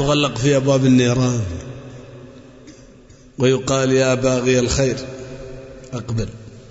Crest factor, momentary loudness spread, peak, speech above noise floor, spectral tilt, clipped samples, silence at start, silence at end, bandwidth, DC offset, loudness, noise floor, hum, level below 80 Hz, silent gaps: 16 dB; 22 LU; -4 dBFS; 28 dB; -5.5 dB/octave; under 0.1%; 0 s; 0.05 s; 8 kHz; under 0.1%; -18 LUFS; -45 dBFS; none; -40 dBFS; none